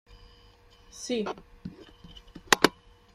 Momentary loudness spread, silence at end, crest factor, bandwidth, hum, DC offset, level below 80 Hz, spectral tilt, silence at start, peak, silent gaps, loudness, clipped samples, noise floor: 27 LU; 0.45 s; 32 dB; 16 kHz; none; under 0.1%; -56 dBFS; -2.5 dB/octave; 0.95 s; 0 dBFS; none; -26 LUFS; under 0.1%; -57 dBFS